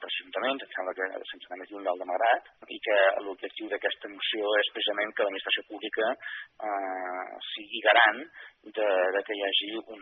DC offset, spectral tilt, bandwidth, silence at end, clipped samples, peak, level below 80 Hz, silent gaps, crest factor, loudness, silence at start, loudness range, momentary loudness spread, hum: under 0.1%; 3 dB/octave; 4.3 kHz; 0 s; under 0.1%; -6 dBFS; -82 dBFS; none; 22 dB; -28 LUFS; 0 s; 3 LU; 14 LU; none